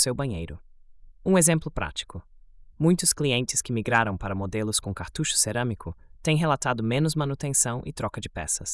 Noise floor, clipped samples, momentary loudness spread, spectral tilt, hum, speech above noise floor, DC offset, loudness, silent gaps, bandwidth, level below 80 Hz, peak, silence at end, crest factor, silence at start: -49 dBFS; under 0.1%; 12 LU; -4 dB/octave; none; 23 dB; under 0.1%; -25 LUFS; none; 12 kHz; -46 dBFS; -6 dBFS; 0 s; 20 dB; 0 s